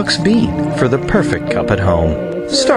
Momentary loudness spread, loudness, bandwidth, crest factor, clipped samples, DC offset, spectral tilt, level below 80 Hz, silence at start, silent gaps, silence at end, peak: 4 LU; -15 LUFS; 11 kHz; 12 dB; under 0.1%; under 0.1%; -5.5 dB/octave; -30 dBFS; 0 s; none; 0 s; -2 dBFS